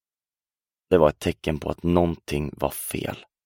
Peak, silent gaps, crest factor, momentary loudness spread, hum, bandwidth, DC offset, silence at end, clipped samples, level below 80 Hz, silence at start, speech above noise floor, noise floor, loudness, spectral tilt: -4 dBFS; none; 22 dB; 10 LU; none; 17 kHz; under 0.1%; 0.25 s; under 0.1%; -42 dBFS; 0.9 s; over 66 dB; under -90 dBFS; -25 LUFS; -6 dB/octave